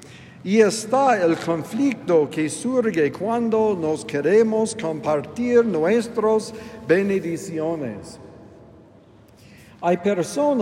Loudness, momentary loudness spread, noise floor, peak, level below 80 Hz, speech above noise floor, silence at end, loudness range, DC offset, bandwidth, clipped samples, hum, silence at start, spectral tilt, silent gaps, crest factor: -21 LUFS; 9 LU; -50 dBFS; -4 dBFS; -62 dBFS; 29 dB; 0 s; 6 LU; under 0.1%; 14 kHz; under 0.1%; none; 0 s; -5.5 dB/octave; none; 18 dB